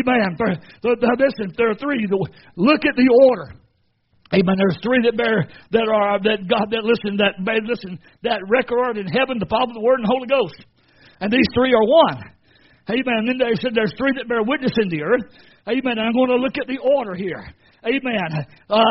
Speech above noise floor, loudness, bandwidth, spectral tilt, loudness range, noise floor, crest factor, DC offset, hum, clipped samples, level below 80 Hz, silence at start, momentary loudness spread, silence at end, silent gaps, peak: 45 dB; -19 LUFS; 5.8 kHz; -4 dB/octave; 3 LU; -64 dBFS; 18 dB; under 0.1%; none; under 0.1%; -52 dBFS; 0 s; 11 LU; 0 s; none; -2 dBFS